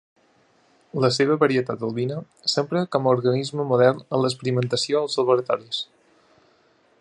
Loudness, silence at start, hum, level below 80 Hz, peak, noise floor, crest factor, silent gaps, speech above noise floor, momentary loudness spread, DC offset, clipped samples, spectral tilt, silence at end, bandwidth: -22 LUFS; 0.95 s; none; -68 dBFS; -4 dBFS; -61 dBFS; 20 dB; none; 39 dB; 9 LU; under 0.1%; under 0.1%; -5.5 dB/octave; 1.15 s; 11.5 kHz